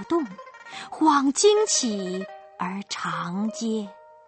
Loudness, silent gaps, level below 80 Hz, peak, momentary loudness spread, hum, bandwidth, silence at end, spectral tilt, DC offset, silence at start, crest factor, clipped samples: -24 LUFS; none; -70 dBFS; -8 dBFS; 20 LU; none; 8.8 kHz; 0.25 s; -3.5 dB/octave; under 0.1%; 0 s; 18 dB; under 0.1%